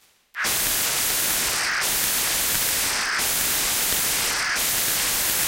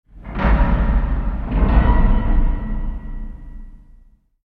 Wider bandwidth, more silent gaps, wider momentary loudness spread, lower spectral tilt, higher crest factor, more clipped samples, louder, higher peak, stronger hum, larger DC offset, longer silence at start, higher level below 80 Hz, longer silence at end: first, 17 kHz vs 4.3 kHz; neither; second, 2 LU vs 19 LU; second, 0.5 dB/octave vs -10 dB/octave; about the same, 20 dB vs 16 dB; neither; about the same, -20 LUFS vs -20 LUFS; about the same, -4 dBFS vs -2 dBFS; neither; neither; first, 0.35 s vs 0.15 s; second, -46 dBFS vs -18 dBFS; second, 0 s vs 0.8 s